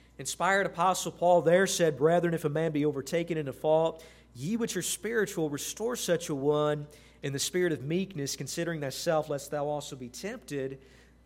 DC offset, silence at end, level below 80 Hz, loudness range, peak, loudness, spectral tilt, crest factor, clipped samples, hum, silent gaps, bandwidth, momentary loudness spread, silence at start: under 0.1%; 0.5 s; -62 dBFS; 5 LU; -10 dBFS; -29 LUFS; -4.5 dB/octave; 18 dB; under 0.1%; none; none; 16.5 kHz; 12 LU; 0.2 s